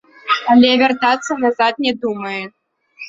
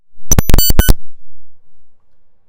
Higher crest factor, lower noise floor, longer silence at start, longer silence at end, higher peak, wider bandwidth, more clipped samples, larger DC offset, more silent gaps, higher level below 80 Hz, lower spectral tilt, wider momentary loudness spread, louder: first, 16 dB vs 10 dB; second, -39 dBFS vs -44 dBFS; first, 0.25 s vs 0.1 s; second, 0 s vs 0.5 s; about the same, 0 dBFS vs 0 dBFS; second, 7.8 kHz vs 17.5 kHz; second, under 0.1% vs 3%; neither; neither; second, -58 dBFS vs -16 dBFS; about the same, -3.5 dB/octave vs -3.5 dB/octave; first, 13 LU vs 5 LU; about the same, -15 LUFS vs -13 LUFS